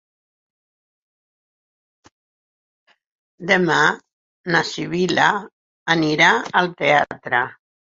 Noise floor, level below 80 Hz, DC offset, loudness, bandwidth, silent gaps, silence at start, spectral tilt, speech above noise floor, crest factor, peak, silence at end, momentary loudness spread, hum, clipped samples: under -90 dBFS; -62 dBFS; under 0.1%; -18 LUFS; 7.8 kHz; 4.13-4.44 s, 5.53-5.86 s; 3.4 s; -4 dB/octave; over 72 dB; 20 dB; -2 dBFS; 0.4 s; 14 LU; none; under 0.1%